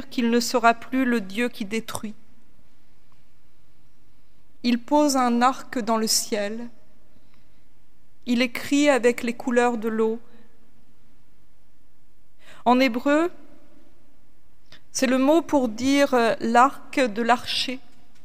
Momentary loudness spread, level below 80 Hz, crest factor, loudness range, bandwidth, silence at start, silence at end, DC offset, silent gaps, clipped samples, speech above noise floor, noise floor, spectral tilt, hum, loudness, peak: 10 LU; -62 dBFS; 22 dB; 8 LU; 16 kHz; 0 s; 0.45 s; 2%; none; under 0.1%; 40 dB; -61 dBFS; -3 dB/octave; none; -22 LUFS; -4 dBFS